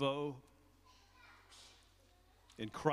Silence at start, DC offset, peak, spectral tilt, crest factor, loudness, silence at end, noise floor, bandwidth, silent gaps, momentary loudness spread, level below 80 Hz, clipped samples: 0 s; under 0.1%; -16 dBFS; -6 dB/octave; 26 dB; -43 LUFS; 0 s; -68 dBFS; 15.5 kHz; none; 28 LU; -70 dBFS; under 0.1%